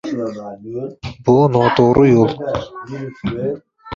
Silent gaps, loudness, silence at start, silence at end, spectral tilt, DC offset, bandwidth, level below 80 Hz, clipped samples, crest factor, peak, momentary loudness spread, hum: none; -16 LUFS; 0.05 s; 0 s; -8 dB/octave; under 0.1%; 7.4 kHz; -44 dBFS; under 0.1%; 16 dB; -2 dBFS; 17 LU; none